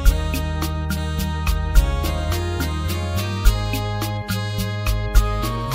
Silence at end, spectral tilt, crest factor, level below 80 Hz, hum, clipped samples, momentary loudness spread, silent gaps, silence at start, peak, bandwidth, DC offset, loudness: 0 s; -5 dB/octave; 20 dB; -22 dBFS; none; under 0.1%; 4 LU; none; 0 s; 0 dBFS; 16.5 kHz; under 0.1%; -23 LUFS